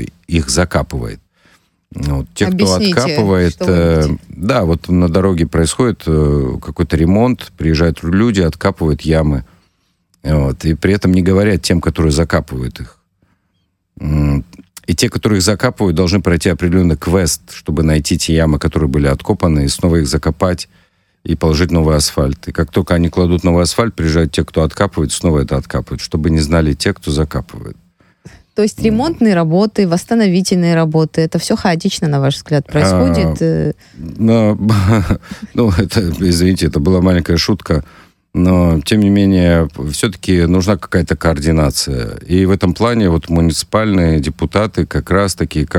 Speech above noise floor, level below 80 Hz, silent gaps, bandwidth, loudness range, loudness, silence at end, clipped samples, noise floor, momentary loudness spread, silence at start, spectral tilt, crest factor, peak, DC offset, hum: 51 dB; -26 dBFS; none; 16.5 kHz; 3 LU; -14 LUFS; 0 s; under 0.1%; -64 dBFS; 8 LU; 0 s; -6 dB/octave; 12 dB; 0 dBFS; under 0.1%; none